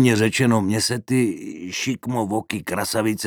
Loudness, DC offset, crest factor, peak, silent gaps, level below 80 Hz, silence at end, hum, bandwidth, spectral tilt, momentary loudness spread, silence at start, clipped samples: -22 LUFS; under 0.1%; 18 dB; -4 dBFS; none; -58 dBFS; 0 s; none; 20 kHz; -5 dB/octave; 8 LU; 0 s; under 0.1%